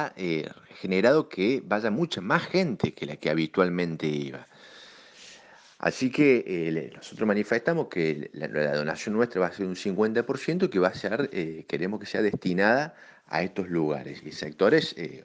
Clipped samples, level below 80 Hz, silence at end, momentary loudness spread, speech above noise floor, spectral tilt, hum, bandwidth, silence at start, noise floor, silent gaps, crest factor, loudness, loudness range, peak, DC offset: under 0.1%; -66 dBFS; 0.05 s; 11 LU; 26 dB; -6 dB/octave; none; 9.4 kHz; 0 s; -52 dBFS; none; 22 dB; -27 LUFS; 2 LU; -6 dBFS; under 0.1%